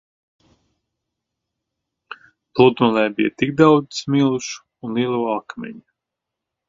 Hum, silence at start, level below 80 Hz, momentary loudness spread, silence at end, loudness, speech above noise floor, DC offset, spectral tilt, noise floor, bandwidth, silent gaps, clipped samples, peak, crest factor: none; 2.1 s; -62 dBFS; 22 LU; 0.9 s; -18 LUFS; 65 dB; under 0.1%; -6 dB/octave; -83 dBFS; 7.6 kHz; none; under 0.1%; 0 dBFS; 20 dB